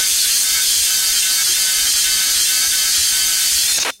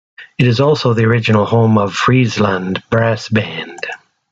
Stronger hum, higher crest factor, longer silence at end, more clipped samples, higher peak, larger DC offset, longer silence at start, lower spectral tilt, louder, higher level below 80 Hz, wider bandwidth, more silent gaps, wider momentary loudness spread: neither; about the same, 12 dB vs 12 dB; second, 0.05 s vs 0.35 s; neither; about the same, -2 dBFS vs -2 dBFS; neither; second, 0 s vs 0.2 s; second, 3.5 dB/octave vs -6.5 dB/octave; about the same, -12 LUFS vs -14 LUFS; about the same, -48 dBFS vs -50 dBFS; first, 16.5 kHz vs 7.8 kHz; neither; second, 0 LU vs 13 LU